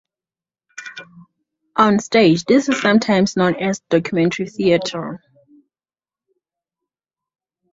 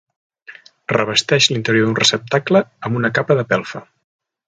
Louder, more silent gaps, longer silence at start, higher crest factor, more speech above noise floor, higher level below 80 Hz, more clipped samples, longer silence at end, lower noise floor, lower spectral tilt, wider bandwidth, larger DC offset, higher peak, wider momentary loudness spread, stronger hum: about the same, -17 LUFS vs -16 LUFS; neither; first, 0.8 s vs 0.5 s; about the same, 18 dB vs 18 dB; first, over 74 dB vs 26 dB; about the same, -58 dBFS vs -58 dBFS; neither; first, 2.55 s vs 0.65 s; first, under -90 dBFS vs -43 dBFS; first, -5.5 dB/octave vs -4 dB/octave; second, 7.8 kHz vs 9.6 kHz; neither; about the same, -2 dBFS vs 0 dBFS; first, 20 LU vs 9 LU; neither